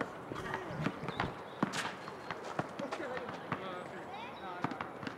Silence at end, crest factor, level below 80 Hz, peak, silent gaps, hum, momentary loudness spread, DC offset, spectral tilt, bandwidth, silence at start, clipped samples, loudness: 0 s; 24 dB; -66 dBFS; -18 dBFS; none; none; 7 LU; under 0.1%; -5 dB/octave; 16 kHz; 0 s; under 0.1%; -40 LUFS